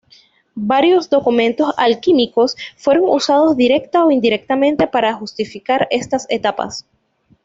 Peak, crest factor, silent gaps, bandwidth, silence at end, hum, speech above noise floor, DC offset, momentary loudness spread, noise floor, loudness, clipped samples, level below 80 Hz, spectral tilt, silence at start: -2 dBFS; 14 dB; none; 7.8 kHz; 0.65 s; none; 36 dB; under 0.1%; 11 LU; -51 dBFS; -15 LUFS; under 0.1%; -56 dBFS; -4.5 dB/octave; 0.55 s